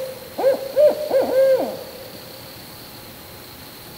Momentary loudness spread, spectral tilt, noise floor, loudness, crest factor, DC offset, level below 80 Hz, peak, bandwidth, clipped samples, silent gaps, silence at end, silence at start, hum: 20 LU; -4 dB/octave; -39 dBFS; -19 LUFS; 16 dB; under 0.1%; -58 dBFS; -6 dBFS; 16 kHz; under 0.1%; none; 0 s; 0 s; none